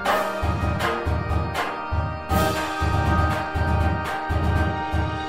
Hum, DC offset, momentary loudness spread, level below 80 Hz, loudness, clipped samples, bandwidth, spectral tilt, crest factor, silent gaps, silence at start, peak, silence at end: none; 0.4%; 5 LU; -30 dBFS; -24 LUFS; under 0.1%; 16 kHz; -6 dB/octave; 16 dB; none; 0 s; -8 dBFS; 0 s